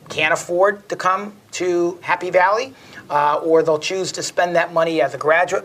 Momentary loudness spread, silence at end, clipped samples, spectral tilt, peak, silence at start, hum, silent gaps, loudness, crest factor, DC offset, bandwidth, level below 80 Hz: 7 LU; 0 s; under 0.1%; -3.5 dB/octave; -2 dBFS; 0.05 s; none; none; -18 LUFS; 16 dB; under 0.1%; 15.5 kHz; -66 dBFS